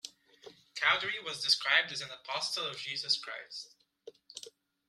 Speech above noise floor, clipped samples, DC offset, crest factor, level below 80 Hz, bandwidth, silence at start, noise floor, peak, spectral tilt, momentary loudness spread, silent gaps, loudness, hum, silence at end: 23 dB; under 0.1%; under 0.1%; 26 dB; -78 dBFS; 14.5 kHz; 0.05 s; -57 dBFS; -10 dBFS; 0 dB/octave; 20 LU; none; -31 LUFS; none; 0.4 s